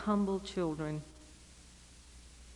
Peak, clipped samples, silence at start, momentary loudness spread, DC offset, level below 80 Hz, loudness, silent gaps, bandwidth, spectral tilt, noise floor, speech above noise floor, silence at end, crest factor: -20 dBFS; under 0.1%; 0 s; 23 LU; under 0.1%; -56 dBFS; -36 LUFS; none; 11.5 kHz; -6.5 dB/octave; -57 dBFS; 22 dB; 0 s; 18 dB